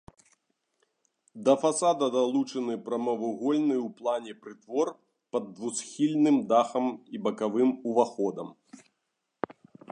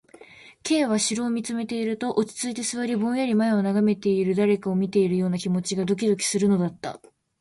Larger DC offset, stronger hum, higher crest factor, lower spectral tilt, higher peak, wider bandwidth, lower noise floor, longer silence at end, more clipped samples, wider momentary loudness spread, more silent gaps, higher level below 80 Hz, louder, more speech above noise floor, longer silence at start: neither; neither; first, 20 dB vs 14 dB; about the same, -5 dB/octave vs -5 dB/octave; about the same, -8 dBFS vs -10 dBFS; about the same, 11 kHz vs 11.5 kHz; first, -81 dBFS vs -49 dBFS; second, 0 s vs 0.45 s; neither; first, 12 LU vs 6 LU; neither; second, -78 dBFS vs -64 dBFS; second, -28 LUFS vs -24 LUFS; first, 54 dB vs 26 dB; first, 1.35 s vs 0.2 s